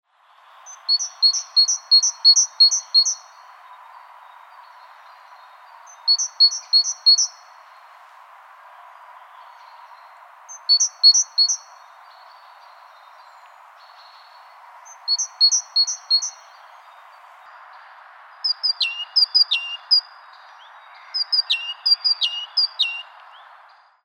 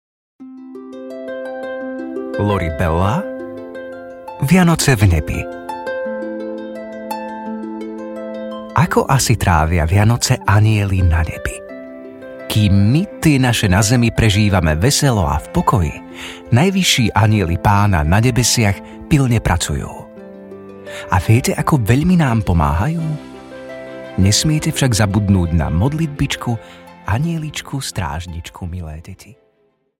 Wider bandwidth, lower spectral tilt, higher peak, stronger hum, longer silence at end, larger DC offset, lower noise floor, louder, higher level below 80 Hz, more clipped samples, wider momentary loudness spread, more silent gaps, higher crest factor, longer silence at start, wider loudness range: about the same, 15.5 kHz vs 16.5 kHz; second, 12.5 dB/octave vs -5 dB/octave; second, -4 dBFS vs 0 dBFS; neither; first, 1.05 s vs 0.65 s; neither; second, -53 dBFS vs -61 dBFS; about the same, -16 LUFS vs -16 LUFS; second, under -90 dBFS vs -32 dBFS; neither; second, 11 LU vs 18 LU; neither; about the same, 18 dB vs 16 dB; first, 0.65 s vs 0.4 s; about the same, 9 LU vs 7 LU